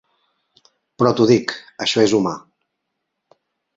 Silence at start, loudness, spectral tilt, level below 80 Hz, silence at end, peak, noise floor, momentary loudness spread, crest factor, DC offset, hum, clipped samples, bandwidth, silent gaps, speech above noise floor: 1 s; -18 LUFS; -5 dB/octave; -60 dBFS; 1.35 s; -2 dBFS; -77 dBFS; 11 LU; 20 dB; under 0.1%; none; under 0.1%; 8 kHz; none; 60 dB